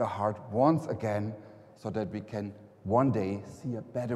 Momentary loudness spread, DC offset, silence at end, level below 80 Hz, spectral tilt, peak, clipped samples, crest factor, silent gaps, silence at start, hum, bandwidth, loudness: 14 LU; under 0.1%; 0 s; -66 dBFS; -8.5 dB/octave; -12 dBFS; under 0.1%; 20 dB; none; 0 s; none; 12.5 kHz; -31 LUFS